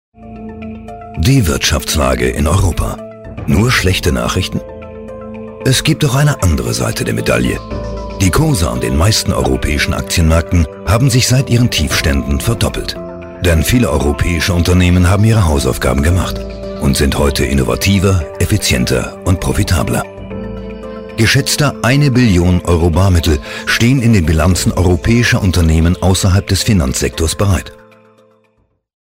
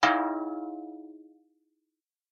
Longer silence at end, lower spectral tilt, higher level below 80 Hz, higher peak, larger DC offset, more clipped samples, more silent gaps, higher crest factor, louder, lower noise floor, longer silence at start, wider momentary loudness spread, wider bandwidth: first, 1.35 s vs 1.1 s; first, -5 dB/octave vs -3 dB/octave; first, -22 dBFS vs -74 dBFS; first, -2 dBFS vs -10 dBFS; neither; neither; neither; second, 10 dB vs 24 dB; first, -13 LUFS vs -31 LUFS; second, -58 dBFS vs -86 dBFS; first, 0.2 s vs 0 s; second, 14 LU vs 22 LU; first, 16.5 kHz vs 8.2 kHz